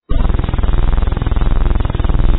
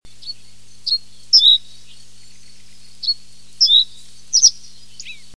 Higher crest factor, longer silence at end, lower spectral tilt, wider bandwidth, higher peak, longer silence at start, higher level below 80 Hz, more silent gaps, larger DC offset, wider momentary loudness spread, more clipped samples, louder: second, 12 dB vs 18 dB; second, 0 s vs 0.25 s; first, -11 dB/octave vs 3.5 dB/octave; second, 4.1 kHz vs 11 kHz; about the same, 0 dBFS vs -2 dBFS; about the same, 0.1 s vs 0 s; first, -14 dBFS vs -60 dBFS; neither; second, under 0.1% vs 2%; second, 1 LU vs 25 LU; neither; second, -18 LUFS vs -13 LUFS